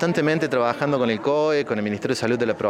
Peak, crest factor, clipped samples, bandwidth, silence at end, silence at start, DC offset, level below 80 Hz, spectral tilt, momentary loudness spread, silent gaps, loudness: -6 dBFS; 16 dB; under 0.1%; 14 kHz; 0 s; 0 s; under 0.1%; -62 dBFS; -6 dB/octave; 4 LU; none; -22 LUFS